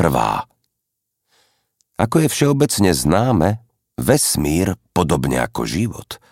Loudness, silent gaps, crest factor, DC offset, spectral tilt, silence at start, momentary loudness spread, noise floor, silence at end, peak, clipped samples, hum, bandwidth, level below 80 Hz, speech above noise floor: -18 LUFS; none; 18 dB; under 0.1%; -5 dB/octave; 0 s; 11 LU; -77 dBFS; 0.15 s; -2 dBFS; under 0.1%; none; 16.5 kHz; -38 dBFS; 60 dB